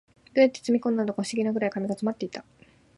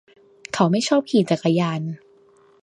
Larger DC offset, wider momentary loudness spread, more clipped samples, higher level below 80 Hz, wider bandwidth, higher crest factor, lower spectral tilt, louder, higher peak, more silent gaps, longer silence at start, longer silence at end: neither; about the same, 11 LU vs 13 LU; neither; about the same, -70 dBFS vs -68 dBFS; about the same, 11.5 kHz vs 11 kHz; about the same, 20 dB vs 20 dB; about the same, -5.5 dB/octave vs -6 dB/octave; second, -26 LUFS vs -21 LUFS; second, -8 dBFS vs -2 dBFS; neither; second, 0.35 s vs 0.55 s; about the same, 0.55 s vs 0.65 s